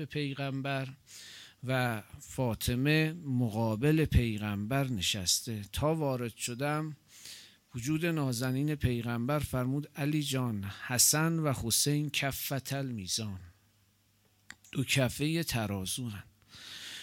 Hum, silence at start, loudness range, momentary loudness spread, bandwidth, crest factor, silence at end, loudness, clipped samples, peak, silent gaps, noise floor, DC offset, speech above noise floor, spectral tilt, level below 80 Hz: none; 0 s; 5 LU; 16 LU; 17 kHz; 22 dB; 0 s; -31 LUFS; under 0.1%; -12 dBFS; none; -69 dBFS; under 0.1%; 37 dB; -4 dB/octave; -50 dBFS